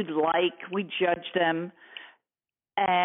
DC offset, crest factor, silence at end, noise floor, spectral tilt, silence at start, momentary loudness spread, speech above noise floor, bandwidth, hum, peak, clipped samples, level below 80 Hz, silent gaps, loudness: under 0.1%; 16 dB; 0 s; under -90 dBFS; -2.5 dB/octave; 0 s; 18 LU; over 63 dB; 3.9 kHz; none; -12 dBFS; under 0.1%; -74 dBFS; none; -27 LUFS